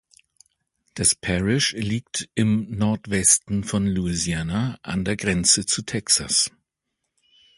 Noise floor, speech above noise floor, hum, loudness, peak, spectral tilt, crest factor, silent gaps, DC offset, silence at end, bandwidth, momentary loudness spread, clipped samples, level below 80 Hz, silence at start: -80 dBFS; 57 dB; none; -21 LUFS; -2 dBFS; -3 dB/octave; 22 dB; none; under 0.1%; 1.1 s; 12 kHz; 9 LU; under 0.1%; -44 dBFS; 0.95 s